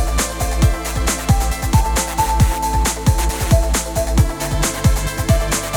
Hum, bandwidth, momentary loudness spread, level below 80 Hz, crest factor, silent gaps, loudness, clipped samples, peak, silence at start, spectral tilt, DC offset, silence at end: none; 19.5 kHz; 3 LU; -20 dBFS; 14 dB; none; -18 LUFS; under 0.1%; -2 dBFS; 0 s; -4.5 dB/octave; under 0.1%; 0 s